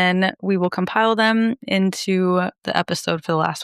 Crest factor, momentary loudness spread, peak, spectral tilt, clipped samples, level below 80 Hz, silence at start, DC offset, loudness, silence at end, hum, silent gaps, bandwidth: 16 dB; 5 LU; -2 dBFS; -5.5 dB/octave; under 0.1%; -64 dBFS; 0 s; under 0.1%; -20 LUFS; 0 s; none; none; 13.5 kHz